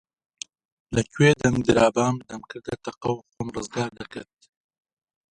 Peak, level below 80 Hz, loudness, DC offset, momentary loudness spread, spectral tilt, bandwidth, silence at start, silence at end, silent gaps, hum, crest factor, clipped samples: -4 dBFS; -50 dBFS; -24 LUFS; under 0.1%; 21 LU; -5.5 dB/octave; 11 kHz; 0.9 s; 1.1 s; none; none; 22 dB; under 0.1%